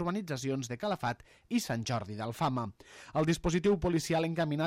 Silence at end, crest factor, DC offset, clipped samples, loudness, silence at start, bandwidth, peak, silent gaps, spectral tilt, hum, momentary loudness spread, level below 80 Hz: 0 s; 16 dB; under 0.1%; under 0.1%; -33 LUFS; 0 s; 16 kHz; -16 dBFS; none; -5.5 dB/octave; none; 9 LU; -52 dBFS